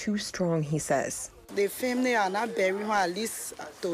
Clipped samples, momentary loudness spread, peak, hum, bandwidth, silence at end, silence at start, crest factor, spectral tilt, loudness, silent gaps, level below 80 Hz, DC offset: under 0.1%; 10 LU; -16 dBFS; none; 15.5 kHz; 0 s; 0 s; 14 dB; -4.5 dB/octave; -29 LUFS; none; -62 dBFS; under 0.1%